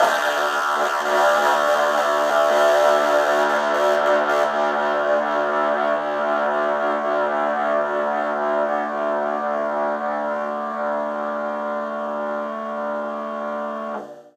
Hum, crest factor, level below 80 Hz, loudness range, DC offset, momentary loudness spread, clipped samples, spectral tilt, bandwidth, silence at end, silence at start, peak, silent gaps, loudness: none; 16 dB; -78 dBFS; 8 LU; under 0.1%; 9 LU; under 0.1%; -3 dB/octave; 15.5 kHz; 0.1 s; 0 s; -4 dBFS; none; -21 LUFS